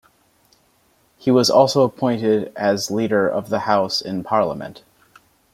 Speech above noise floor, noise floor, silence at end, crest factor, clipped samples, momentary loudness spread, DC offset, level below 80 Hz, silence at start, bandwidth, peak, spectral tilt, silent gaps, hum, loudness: 42 dB; -60 dBFS; 0.75 s; 18 dB; under 0.1%; 9 LU; under 0.1%; -62 dBFS; 1.25 s; 16 kHz; -2 dBFS; -5 dB/octave; none; none; -19 LUFS